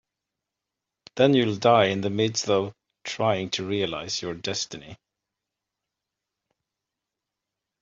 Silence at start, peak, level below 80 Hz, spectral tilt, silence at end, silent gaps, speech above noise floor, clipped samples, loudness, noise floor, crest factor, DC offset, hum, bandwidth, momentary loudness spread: 1.15 s; -6 dBFS; -66 dBFS; -4.5 dB/octave; 2.85 s; none; 62 dB; under 0.1%; -24 LUFS; -86 dBFS; 22 dB; under 0.1%; none; 7.8 kHz; 15 LU